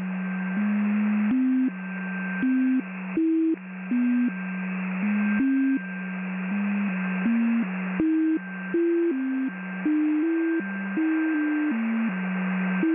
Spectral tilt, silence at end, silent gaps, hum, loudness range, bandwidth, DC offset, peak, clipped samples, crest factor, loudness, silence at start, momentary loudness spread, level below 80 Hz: -7.5 dB/octave; 0 s; none; none; 1 LU; 3.6 kHz; under 0.1%; -12 dBFS; under 0.1%; 14 dB; -26 LUFS; 0 s; 6 LU; -66 dBFS